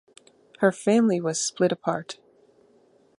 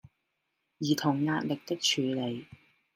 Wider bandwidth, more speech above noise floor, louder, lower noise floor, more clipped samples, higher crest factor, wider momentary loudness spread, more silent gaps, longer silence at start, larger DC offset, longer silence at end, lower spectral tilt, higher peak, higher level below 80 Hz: second, 11.5 kHz vs 16 kHz; second, 37 dB vs 51 dB; first, -24 LUFS vs -30 LUFS; second, -60 dBFS vs -81 dBFS; neither; about the same, 20 dB vs 18 dB; first, 13 LU vs 9 LU; neither; second, 0.6 s vs 0.8 s; neither; first, 1.05 s vs 0.4 s; about the same, -4.5 dB/octave vs -4 dB/octave; first, -6 dBFS vs -14 dBFS; about the same, -74 dBFS vs -74 dBFS